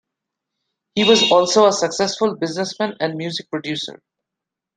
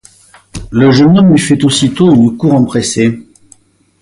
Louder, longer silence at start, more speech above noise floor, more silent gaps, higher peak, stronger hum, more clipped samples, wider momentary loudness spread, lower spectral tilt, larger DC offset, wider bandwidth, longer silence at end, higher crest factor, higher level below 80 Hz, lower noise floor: second, -18 LUFS vs -9 LUFS; first, 0.95 s vs 0.55 s; first, 66 dB vs 38 dB; neither; about the same, -2 dBFS vs 0 dBFS; neither; neither; about the same, 13 LU vs 12 LU; second, -3.5 dB/octave vs -6 dB/octave; neither; second, 9.6 kHz vs 11.5 kHz; about the same, 0.85 s vs 0.8 s; first, 18 dB vs 10 dB; second, -62 dBFS vs -38 dBFS; first, -84 dBFS vs -46 dBFS